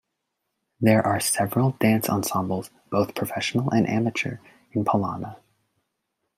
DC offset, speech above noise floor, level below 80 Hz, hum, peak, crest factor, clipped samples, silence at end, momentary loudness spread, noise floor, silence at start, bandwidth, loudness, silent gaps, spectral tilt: under 0.1%; 56 dB; -64 dBFS; none; -6 dBFS; 18 dB; under 0.1%; 1 s; 11 LU; -80 dBFS; 0.8 s; 16 kHz; -24 LUFS; none; -5.5 dB/octave